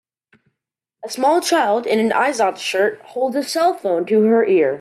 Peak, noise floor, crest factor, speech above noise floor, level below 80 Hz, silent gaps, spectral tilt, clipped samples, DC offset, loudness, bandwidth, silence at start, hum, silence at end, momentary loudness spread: -4 dBFS; -81 dBFS; 14 dB; 64 dB; -70 dBFS; none; -4 dB/octave; under 0.1%; under 0.1%; -17 LUFS; 14.5 kHz; 1.05 s; none; 0 s; 7 LU